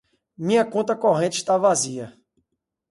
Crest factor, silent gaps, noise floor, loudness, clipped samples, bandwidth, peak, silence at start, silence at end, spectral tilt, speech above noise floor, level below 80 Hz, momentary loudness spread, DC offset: 16 dB; none; -77 dBFS; -21 LUFS; under 0.1%; 11.5 kHz; -6 dBFS; 0.4 s; 0.8 s; -4 dB/octave; 56 dB; -70 dBFS; 12 LU; under 0.1%